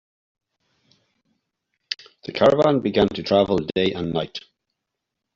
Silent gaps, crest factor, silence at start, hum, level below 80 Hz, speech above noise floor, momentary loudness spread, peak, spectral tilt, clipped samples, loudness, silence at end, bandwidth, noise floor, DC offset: none; 20 dB; 1.9 s; none; -54 dBFS; 62 dB; 15 LU; -4 dBFS; -4.5 dB/octave; under 0.1%; -21 LUFS; 0.95 s; 7.6 kHz; -82 dBFS; under 0.1%